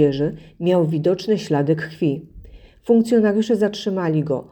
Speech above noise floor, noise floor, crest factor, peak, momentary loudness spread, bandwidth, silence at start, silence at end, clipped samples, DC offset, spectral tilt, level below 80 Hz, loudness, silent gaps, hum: 23 dB; -42 dBFS; 16 dB; -4 dBFS; 8 LU; 19 kHz; 0 s; 0.1 s; under 0.1%; under 0.1%; -7.5 dB/octave; -50 dBFS; -20 LUFS; none; none